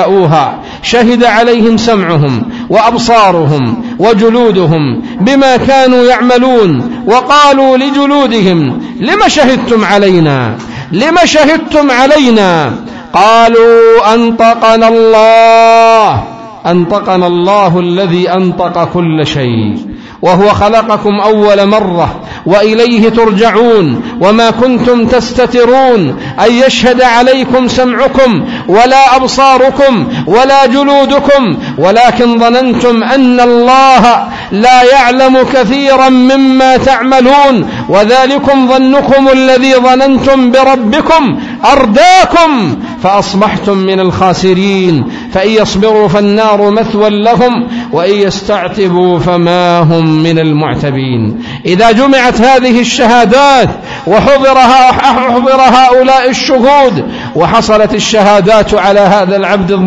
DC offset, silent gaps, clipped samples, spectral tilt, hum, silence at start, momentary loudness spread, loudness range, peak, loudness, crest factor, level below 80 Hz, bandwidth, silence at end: under 0.1%; none; 3%; -5.5 dB/octave; none; 0 s; 8 LU; 3 LU; 0 dBFS; -6 LUFS; 6 dB; -34 dBFS; 11 kHz; 0 s